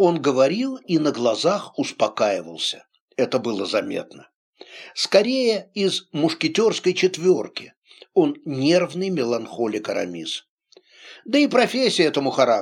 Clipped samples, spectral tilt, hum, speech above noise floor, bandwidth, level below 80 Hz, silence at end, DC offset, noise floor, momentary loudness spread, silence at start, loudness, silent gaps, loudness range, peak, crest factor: under 0.1%; -4.5 dB/octave; none; 31 dB; 12.5 kHz; -74 dBFS; 0 s; under 0.1%; -52 dBFS; 11 LU; 0 s; -21 LUFS; 3.00-3.08 s, 4.34-4.53 s, 7.77-7.82 s, 10.49-10.58 s; 3 LU; -2 dBFS; 18 dB